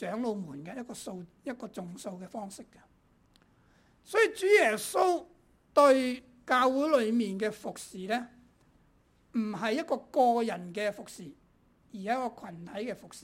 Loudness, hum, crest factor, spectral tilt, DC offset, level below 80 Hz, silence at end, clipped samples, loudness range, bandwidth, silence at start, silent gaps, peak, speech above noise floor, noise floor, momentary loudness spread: -29 LUFS; none; 20 dB; -4.5 dB/octave; under 0.1%; -70 dBFS; 0.05 s; under 0.1%; 13 LU; 16 kHz; 0 s; none; -10 dBFS; 36 dB; -66 dBFS; 18 LU